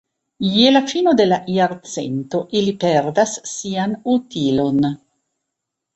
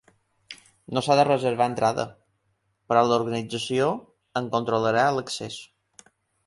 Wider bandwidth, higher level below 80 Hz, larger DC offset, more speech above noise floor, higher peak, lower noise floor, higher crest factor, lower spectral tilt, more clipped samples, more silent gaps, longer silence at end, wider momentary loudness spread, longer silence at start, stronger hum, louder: second, 8.2 kHz vs 11.5 kHz; first, -56 dBFS vs -64 dBFS; neither; first, 62 dB vs 49 dB; about the same, -2 dBFS vs -4 dBFS; first, -80 dBFS vs -72 dBFS; about the same, 18 dB vs 22 dB; about the same, -5 dB/octave vs -5 dB/octave; neither; neither; first, 1 s vs 0.8 s; second, 10 LU vs 16 LU; about the same, 0.4 s vs 0.5 s; neither; first, -18 LUFS vs -24 LUFS